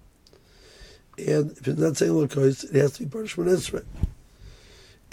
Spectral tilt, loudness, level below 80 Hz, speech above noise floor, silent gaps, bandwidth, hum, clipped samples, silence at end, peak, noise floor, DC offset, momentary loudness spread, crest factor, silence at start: -6 dB/octave; -25 LUFS; -42 dBFS; 32 dB; none; 16.5 kHz; none; under 0.1%; 0.6 s; -6 dBFS; -55 dBFS; under 0.1%; 11 LU; 20 dB; 0.8 s